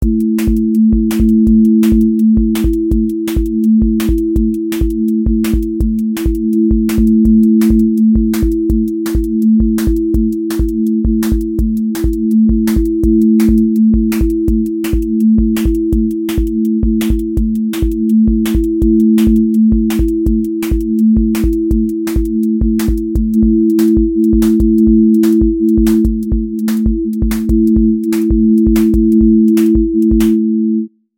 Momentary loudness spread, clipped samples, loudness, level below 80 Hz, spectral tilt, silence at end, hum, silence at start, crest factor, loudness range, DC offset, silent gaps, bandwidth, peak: 6 LU; under 0.1%; -12 LUFS; -20 dBFS; -8 dB/octave; 0.3 s; none; 0 s; 10 dB; 3 LU; under 0.1%; none; 17 kHz; 0 dBFS